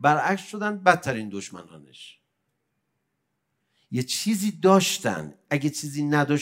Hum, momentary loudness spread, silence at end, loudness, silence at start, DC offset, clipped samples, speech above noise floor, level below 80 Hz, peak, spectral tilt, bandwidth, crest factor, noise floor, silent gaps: none; 17 LU; 0 s; -24 LUFS; 0 s; under 0.1%; under 0.1%; 53 dB; -68 dBFS; -2 dBFS; -4.5 dB/octave; 16 kHz; 24 dB; -77 dBFS; none